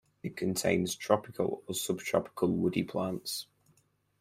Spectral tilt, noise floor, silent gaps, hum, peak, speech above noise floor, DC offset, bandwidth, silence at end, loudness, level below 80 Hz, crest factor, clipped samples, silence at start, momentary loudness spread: -4.5 dB/octave; -71 dBFS; none; none; -10 dBFS; 39 dB; under 0.1%; 16 kHz; 0.8 s; -32 LUFS; -66 dBFS; 24 dB; under 0.1%; 0.25 s; 8 LU